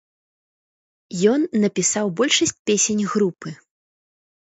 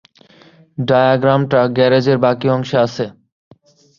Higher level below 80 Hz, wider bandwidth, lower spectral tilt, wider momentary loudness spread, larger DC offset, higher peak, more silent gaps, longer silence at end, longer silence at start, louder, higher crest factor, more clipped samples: second, -64 dBFS vs -56 dBFS; first, 8.2 kHz vs 7.2 kHz; second, -3.5 dB/octave vs -7.5 dB/octave; about the same, 10 LU vs 12 LU; neither; about the same, -2 dBFS vs -2 dBFS; first, 2.59-2.65 s vs none; first, 1.05 s vs 0.9 s; first, 1.1 s vs 0.8 s; second, -19 LUFS vs -15 LUFS; first, 20 dB vs 14 dB; neither